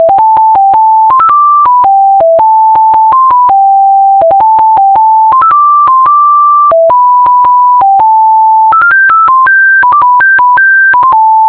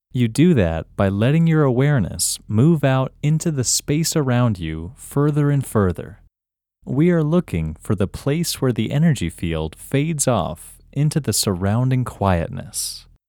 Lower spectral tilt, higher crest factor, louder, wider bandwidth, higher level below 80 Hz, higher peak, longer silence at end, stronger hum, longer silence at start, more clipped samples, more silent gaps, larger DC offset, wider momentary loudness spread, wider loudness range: about the same, -6.5 dB/octave vs -5.5 dB/octave; second, 4 dB vs 16 dB; first, -4 LUFS vs -19 LUFS; second, 4 kHz vs 19 kHz; about the same, -46 dBFS vs -42 dBFS; about the same, 0 dBFS vs -2 dBFS; second, 0 s vs 0.3 s; neither; second, 0 s vs 0.15 s; neither; neither; neither; second, 1 LU vs 10 LU; about the same, 1 LU vs 3 LU